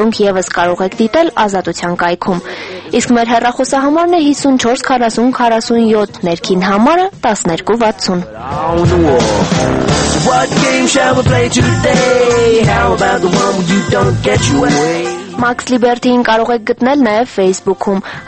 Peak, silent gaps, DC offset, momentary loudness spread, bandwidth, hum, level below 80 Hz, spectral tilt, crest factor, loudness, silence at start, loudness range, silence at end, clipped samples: 0 dBFS; none; under 0.1%; 6 LU; 8.8 kHz; none; -34 dBFS; -5 dB/octave; 12 dB; -11 LUFS; 0 s; 2 LU; 0 s; under 0.1%